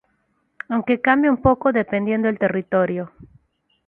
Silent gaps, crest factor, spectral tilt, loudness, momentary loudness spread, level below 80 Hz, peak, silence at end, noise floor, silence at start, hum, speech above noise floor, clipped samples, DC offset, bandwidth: none; 18 dB; -10.5 dB/octave; -20 LUFS; 10 LU; -46 dBFS; -2 dBFS; 0.6 s; -67 dBFS; 0.7 s; none; 48 dB; under 0.1%; under 0.1%; 4 kHz